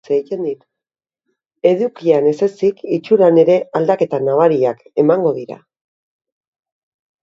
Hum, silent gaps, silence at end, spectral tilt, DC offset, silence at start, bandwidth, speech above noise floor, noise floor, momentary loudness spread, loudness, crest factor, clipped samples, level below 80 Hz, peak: none; none; 1.7 s; -8 dB/octave; under 0.1%; 0.1 s; 7.6 kHz; 73 dB; -87 dBFS; 11 LU; -15 LUFS; 16 dB; under 0.1%; -66 dBFS; 0 dBFS